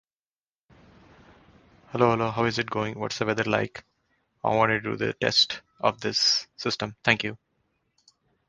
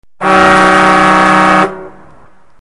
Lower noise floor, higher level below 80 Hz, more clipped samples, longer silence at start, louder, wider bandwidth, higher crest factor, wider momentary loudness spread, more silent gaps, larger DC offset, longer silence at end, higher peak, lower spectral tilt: first, under -90 dBFS vs -44 dBFS; second, -60 dBFS vs -38 dBFS; neither; first, 1.9 s vs 0.2 s; second, -25 LUFS vs -7 LUFS; second, 10 kHz vs 11.5 kHz; first, 26 dB vs 10 dB; first, 9 LU vs 5 LU; neither; second, under 0.1% vs 1%; first, 1.15 s vs 0.7 s; about the same, -2 dBFS vs 0 dBFS; about the same, -3.5 dB/octave vs -4.5 dB/octave